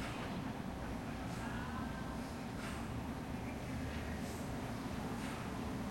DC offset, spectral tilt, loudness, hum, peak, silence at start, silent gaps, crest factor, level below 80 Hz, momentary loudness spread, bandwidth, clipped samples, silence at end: under 0.1%; -5.5 dB/octave; -43 LUFS; none; -30 dBFS; 0 s; none; 12 dB; -52 dBFS; 2 LU; 16 kHz; under 0.1%; 0 s